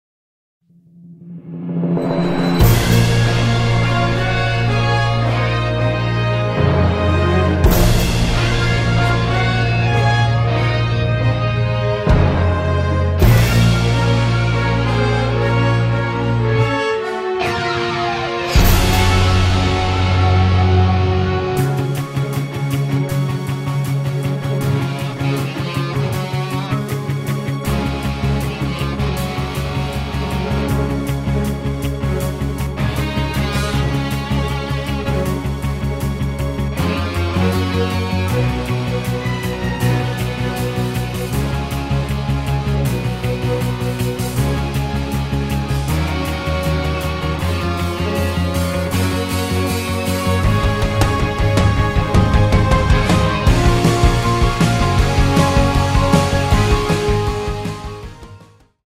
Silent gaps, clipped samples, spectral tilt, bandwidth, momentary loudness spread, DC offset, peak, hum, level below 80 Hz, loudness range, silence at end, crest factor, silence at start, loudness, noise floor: none; under 0.1%; -6 dB/octave; 16 kHz; 7 LU; under 0.1%; 0 dBFS; none; -24 dBFS; 6 LU; 0.4 s; 16 dB; 1.05 s; -17 LUFS; -44 dBFS